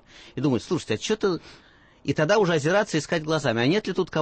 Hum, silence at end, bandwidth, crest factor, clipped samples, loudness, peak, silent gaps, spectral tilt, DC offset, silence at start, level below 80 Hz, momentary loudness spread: none; 0 s; 8.8 kHz; 16 dB; under 0.1%; -24 LUFS; -8 dBFS; none; -5.5 dB/octave; under 0.1%; 0.15 s; -56 dBFS; 8 LU